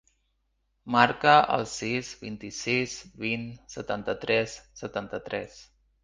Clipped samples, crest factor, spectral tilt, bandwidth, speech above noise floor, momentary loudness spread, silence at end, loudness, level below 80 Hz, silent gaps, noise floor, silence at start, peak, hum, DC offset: under 0.1%; 26 dB; -4 dB/octave; 9.8 kHz; 47 dB; 18 LU; 0.4 s; -27 LUFS; -60 dBFS; none; -74 dBFS; 0.85 s; -2 dBFS; none; under 0.1%